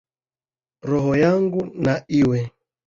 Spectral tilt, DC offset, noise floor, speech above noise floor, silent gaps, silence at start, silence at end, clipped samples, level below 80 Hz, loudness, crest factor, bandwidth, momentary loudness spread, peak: -8 dB/octave; under 0.1%; under -90 dBFS; over 71 dB; none; 0.85 s; 0.35 s; under 0.1%; -50 dBFS; -20 LUFS; 18 dB; 7.4 kHz; 9 LU; -4 dBFS